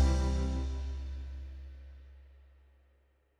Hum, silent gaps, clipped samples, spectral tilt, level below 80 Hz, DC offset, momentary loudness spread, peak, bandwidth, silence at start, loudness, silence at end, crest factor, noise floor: none; none; under 0.1%; -6.5 dB/octave; -36 dBFS; under 0.1%; 23 LU; -18 dBFS; 9.4 kHz; 0 s; -36 LUFS; 1.05 s; 18 dB; -69 dBFS